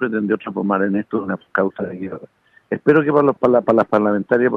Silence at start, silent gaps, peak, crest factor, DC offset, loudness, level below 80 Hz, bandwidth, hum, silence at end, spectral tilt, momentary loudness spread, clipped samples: 0 s; none; -2 dBFS; 16 dB; under 0.1%; -18 LUFS; -62 dBFS; 5.6 kHz; none; 0 s; -9.5 dB/octave; 13 LU; under 0.1%